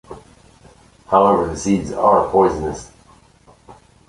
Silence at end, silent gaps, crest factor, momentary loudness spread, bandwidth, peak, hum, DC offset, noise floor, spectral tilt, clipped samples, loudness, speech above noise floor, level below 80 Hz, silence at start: 0.35 s; none; 18 dB; 12 LU; 11.5 kHz; -2 dBFS; none; under 0.1%; -50 dBFS; -6.5 dB/octave; under 0.1%; -17 LUFS; 34 dB; -42 dBFS; 0.1 s